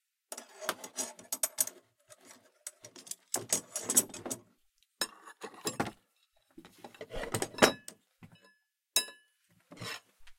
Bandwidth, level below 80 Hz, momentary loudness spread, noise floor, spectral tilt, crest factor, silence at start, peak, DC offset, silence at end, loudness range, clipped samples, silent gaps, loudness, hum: 16.5 kHz; -62 dBFS; 21 LU; -73 dBFS; -1.5 dB/octave; 34 dB; 0.3 s; -4 dBFS; under 0.1%; 0.05 s; 4 LU; under 0.1%; none; -33 LUFS; none